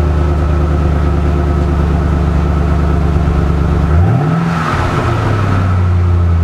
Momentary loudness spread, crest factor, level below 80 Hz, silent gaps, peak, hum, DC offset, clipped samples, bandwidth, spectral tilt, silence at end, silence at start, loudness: 2 LU; 10 dB; -16 dBFS; none; 0 dBFS; none; under 0.1%; under 0.1%; 8.4 kHz; -8 dB/octave; 0 s; 0 s; -13 LUFS